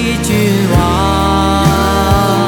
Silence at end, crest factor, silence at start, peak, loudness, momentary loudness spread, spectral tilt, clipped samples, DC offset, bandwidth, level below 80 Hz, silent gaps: 0 s; 10 dB; 0 s; 0 dBFS; -11 LUFS; 1 LU; -5.5 dB/octave; under 0.1%; under 0.1%; 19.5 kHz; -24 dBFS; none